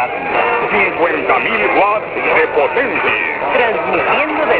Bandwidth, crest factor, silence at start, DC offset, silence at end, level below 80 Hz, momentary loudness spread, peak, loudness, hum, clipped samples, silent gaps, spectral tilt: 4 kHz; 14 dB; 0 s; under 0.1%; 0 s; -48 dBFS; 3 LU; 0 dBFS; -13 LUFS; none; under 0.1%; none; -7.5 dB/octave